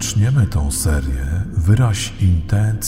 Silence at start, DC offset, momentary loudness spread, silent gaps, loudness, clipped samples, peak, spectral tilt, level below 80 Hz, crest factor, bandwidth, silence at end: 0 s; under 0.1%; 6 LU; none; -18 LUFS; under 0.1%; -2 dBFS; -5.5 dB/octave; -24 dBFS; 14 dB; 16 kHz; 0 s